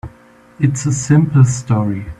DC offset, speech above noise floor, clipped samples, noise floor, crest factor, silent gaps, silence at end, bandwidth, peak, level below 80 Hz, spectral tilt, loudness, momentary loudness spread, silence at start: under 0.1%; 32 dB; under 0.1%; -45 dBFS; 14 dB; none; 0.05 s; 11 kHz; 0 dBFS; -42 dBFS; -7 dB/octave; -15 LUFS; 7 LU; 0.05 s